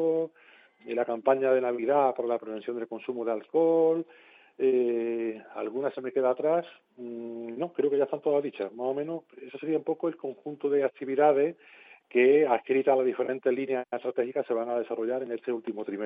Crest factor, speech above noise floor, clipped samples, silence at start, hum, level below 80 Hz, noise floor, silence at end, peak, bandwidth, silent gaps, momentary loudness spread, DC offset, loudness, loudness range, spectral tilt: 18 dB; 30 dB; under 0.1%; 0 s; none; under -90 dBFS; -58 dBFS; 0 s; -10 dBFS; 4.7 kHz; none; 13 LU; under 0.1%; -28 LUFS; 5 LU; -9.5 dB/octave